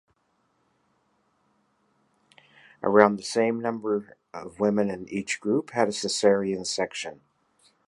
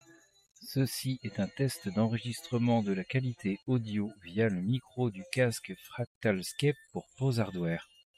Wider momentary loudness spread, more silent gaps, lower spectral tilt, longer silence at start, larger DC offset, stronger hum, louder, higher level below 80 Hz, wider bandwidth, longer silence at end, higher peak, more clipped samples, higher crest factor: first, 14 LU vs 8 LU; second, none vs 6.07-6.21 s; second, -4.5 dB/octave vs -6 dB/octave; first, 2.8 s vs 0.6 s; neither; neither; first, -25 LUFS vs -33 LUFS; about the same, -68 dBFS vs -68 dBFS; second, 11.5 kHz vs 15 kHz; first, 0.75 s vs 0.35 s; first, 0 dBFS vs -14 dBFS; neither; first, 26 dB vs 18 dB